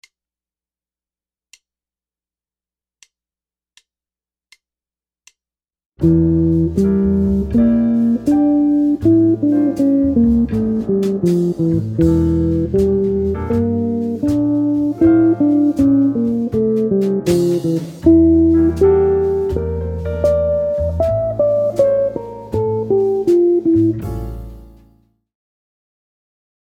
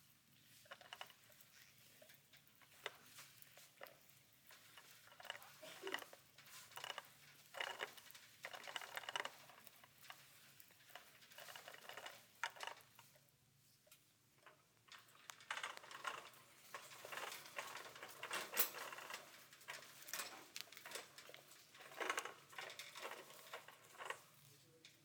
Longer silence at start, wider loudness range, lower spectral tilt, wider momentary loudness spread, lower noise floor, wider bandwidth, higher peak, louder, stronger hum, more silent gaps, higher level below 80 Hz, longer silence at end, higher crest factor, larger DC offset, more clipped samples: first, 6 s vs 0 s; second, 4 LU vs 12 LU; first, -9.5 dB/octave vs -0.5 dB/octave; second, 6 LU vs 18 LU; first, under -90 dBFS vs -74 dBFS; second, 10.5 kHz vs over 20 kHz; first, 0 dBFS vs -20 dBFS; first, -15 LUFS vs -51 LUFS; neither; neither; first, -34 dBFS vs under -90 dBFS; first, 2.15 s vs 0 s; second, 16 dB vs 34 dB; neither; neither